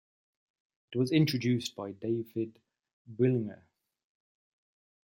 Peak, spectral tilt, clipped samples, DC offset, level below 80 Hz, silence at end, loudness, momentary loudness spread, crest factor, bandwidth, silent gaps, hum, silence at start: -14 dBFS; -6.5 dB/octave; under 0.1%; under 0.1%; -74 dBFS; 1.5 s; -31 LUFS; 13 LU; 20 dB; 16.5 kHz; 2.93-3.05 s; none; 0.9 s